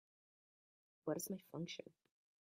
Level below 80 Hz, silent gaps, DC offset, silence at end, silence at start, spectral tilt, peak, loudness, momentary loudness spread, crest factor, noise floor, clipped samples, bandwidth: under -90 dBFS; none; under 0.1%; 0.5 s; 1.05 s; -4.5 dB/octave; -28 dBFS; -47 LUFS; 9 LU; 22 dB; under -90 dBFS; under 0.1%; 15 kHz